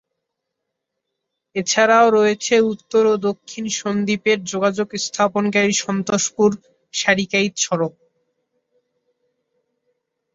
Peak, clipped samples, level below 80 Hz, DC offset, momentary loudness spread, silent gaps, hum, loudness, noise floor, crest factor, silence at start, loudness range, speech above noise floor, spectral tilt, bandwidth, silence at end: -2 dBFS; under 0.1%; -64 dBFS; under 0.1%; 10 LU; none; none; -18 LUFS; -79 dBFS; 18 dB; 1.55 s; 6 LU; 61 dB; -3.5 dB/octave; 8 kHz; 2.45 s